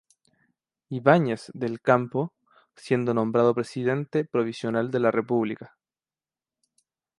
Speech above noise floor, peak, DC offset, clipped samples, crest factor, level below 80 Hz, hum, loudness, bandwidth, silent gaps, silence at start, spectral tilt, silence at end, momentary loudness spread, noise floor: over 66 dB; -4 dBFS; under 0.1%; under 0.1%; 22 dB; -70 dBFS; none; -25 LUFS; 11.5 kHz; none; 0.9 s; -7.5 dB/octave; 1.5 s; 10 LU; under -90 dBFS